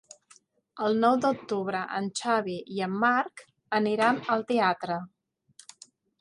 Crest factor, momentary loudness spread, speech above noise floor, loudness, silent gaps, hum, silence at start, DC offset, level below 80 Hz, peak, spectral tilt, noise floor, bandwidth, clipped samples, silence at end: 18 dB; 10 LU; 34 dB; -27 LUFS; none; none; 0.75 s; under 0.1%; -76 dBFS; -10 dBFS; -5 dB/octave; -61 dBFS; 11.5 kHz; under 0.1%; 1.15 s